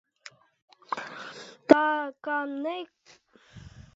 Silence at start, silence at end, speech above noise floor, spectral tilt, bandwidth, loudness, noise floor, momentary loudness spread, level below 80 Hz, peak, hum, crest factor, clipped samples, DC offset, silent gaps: 0.25 s; 0.15 s; 34 dB; -3 dB/octave; 7.6 kHz; -27 LUFS; -59 dBFS; 28 LU; -64 dBFS; 0 dBFS; none; 30 dB; under 0.1%; under 0.1%; 0.62-0.68 s